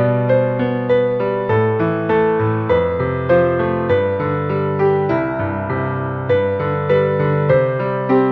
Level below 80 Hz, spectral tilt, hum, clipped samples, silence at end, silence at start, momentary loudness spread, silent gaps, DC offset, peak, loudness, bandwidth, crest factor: -46 dBFS; -10 dB/octave; none; under 0.1%; 0 s; 0 s; 5 LU; none; under 0.1%; -2 dBFS; -17 LUFS; 4.9 kHz; 14 dB